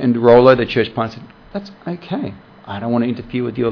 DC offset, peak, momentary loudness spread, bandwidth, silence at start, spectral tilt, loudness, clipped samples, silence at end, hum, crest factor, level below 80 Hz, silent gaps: under 0.1%; 0 dBFS; 20 LU; 5.4 kHz; 0 s; -8.5 dB/octave; -16 LUFS; under 0.1%; 0 s; none; 16 dB; -46 dBFS; none